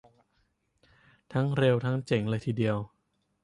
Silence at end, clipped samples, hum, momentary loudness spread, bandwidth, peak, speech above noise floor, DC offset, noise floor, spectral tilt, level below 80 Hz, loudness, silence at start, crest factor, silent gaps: 0.6 s; under 0.1%; none; 9 LU; 11 kHz; -12 dBFS; 46 dB; under 0.1%; -73 dBFS; -8 dB/octave; -62 dBFS; -29 LUFS; 1.3 s; 18 dB; none